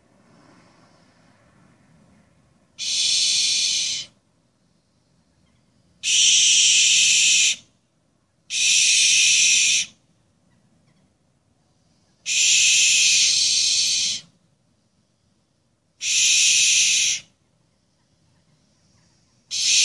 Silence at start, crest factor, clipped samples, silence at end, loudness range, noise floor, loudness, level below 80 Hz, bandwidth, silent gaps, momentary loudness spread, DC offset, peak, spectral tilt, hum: 2.8 s; 18 dB; under 0.1%; 0 s; 7 LU; -67 dBFS; -16 LUFS; -70 dBFS; 12 kHz; none; 15 LU; under 0.1%; -4 dBFS; 4.5 dB/octave; none